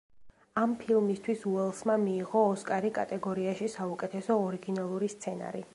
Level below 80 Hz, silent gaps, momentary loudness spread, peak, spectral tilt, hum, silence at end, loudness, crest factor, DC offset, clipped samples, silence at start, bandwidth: -72 dBFS; none; 8 LU; -14 dBFS; -6.5 dB/octave; none; 0.1 s; -31 LUFS; 18 dB; under 0.1%; under 0.1%; 0.15 s; 11.5 kHz